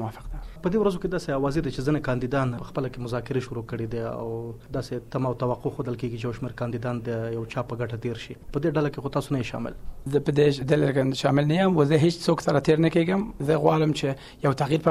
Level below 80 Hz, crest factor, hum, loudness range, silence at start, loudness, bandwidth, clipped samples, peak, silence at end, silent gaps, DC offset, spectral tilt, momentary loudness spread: -44 dBFS; 20 dB; none; 8 LU; 0 s; -26 LUFS; 14 kHz; under 0.1%; -6 dBFS; 0 s; none; under 0.1%; -7 dB/octave; 11 LU